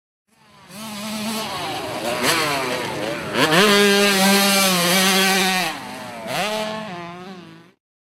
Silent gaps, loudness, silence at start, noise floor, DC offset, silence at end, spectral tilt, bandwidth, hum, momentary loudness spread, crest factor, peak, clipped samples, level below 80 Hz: none; -18 LUFS; 0.7 s; -46 dBFS; under 0.1%; 0.45 s; -2.5 dB/octave; 16 kHz; none; 18 LU; 18 dB; -2 dBFS; under 0.1%; -60 dBFS